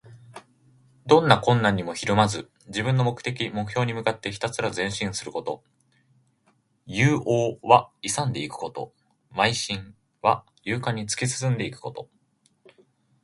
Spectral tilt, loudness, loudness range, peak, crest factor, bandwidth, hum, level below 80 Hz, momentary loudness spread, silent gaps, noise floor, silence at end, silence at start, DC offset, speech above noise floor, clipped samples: -5 dB/octave; -24 LUFS; 6 LU; 0 dBFS; 26 dB; 11.5 kHz; none; -56 dBFS; 15 LU; none; -67 dBFS; 1.2 s; 0.05 s; under 0.1%; 43 dB; under 0.1%